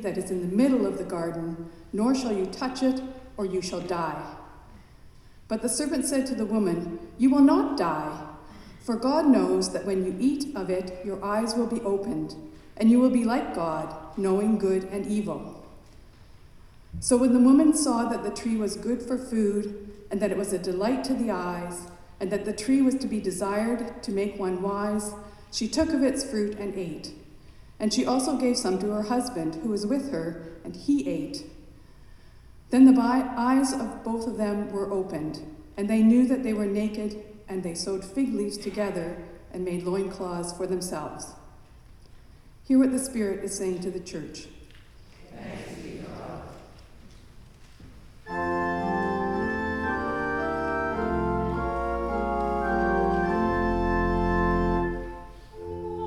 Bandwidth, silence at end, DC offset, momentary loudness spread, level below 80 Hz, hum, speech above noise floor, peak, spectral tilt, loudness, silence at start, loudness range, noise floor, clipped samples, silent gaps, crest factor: 13 kHz; 0 s; under 0.1%; 17 LU; -44 dBFS; none; 24 dB; -8 dBFS; -5.5 dB/octave; -26 LUFS; 0 s; 8 LU; -50 dBFS; under 0.1%; none; 20 dB